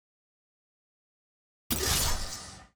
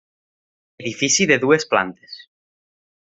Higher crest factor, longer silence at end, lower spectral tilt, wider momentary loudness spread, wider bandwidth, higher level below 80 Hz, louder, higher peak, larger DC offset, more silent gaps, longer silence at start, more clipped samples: about the same, 20 dB vs 20 dB; second, 0.1 s vs 0.95 s; about the same, -2 dB/octave vs -3 dB/octave; second, 13 LU vs 23 LU; first, over 20 kHz vs 8.2 kHz; first, -42 dBFS vs -62 dBFS; second, -29 LUFS vs -17 LUFS; second, -14 dBFS vs -2 dBFS; neither; neither; first, 1.7 s vs 0.8 s; neither